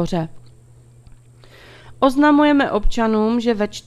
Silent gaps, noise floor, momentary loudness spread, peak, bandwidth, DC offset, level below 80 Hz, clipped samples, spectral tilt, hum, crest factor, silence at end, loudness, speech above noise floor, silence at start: none; -47 dBFS; 10 LU; -2 dBFS; 12.5 kHz; under 0.1%; -34 dBFS; under 0.1%; -6 dB/octave; none; 18 dB; 0.05 s; -17 LUFS; 30 dB; 0 s